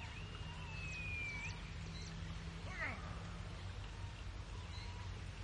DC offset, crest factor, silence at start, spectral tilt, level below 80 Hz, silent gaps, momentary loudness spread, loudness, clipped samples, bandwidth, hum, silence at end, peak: under 0.1%; 16 dB; 0 s; -4.5 dB/octave; -52 dBFS; none; 7 LU; -47 LUFS; under 0.1%; 11 kHz; none; 0 s; -30 dBFS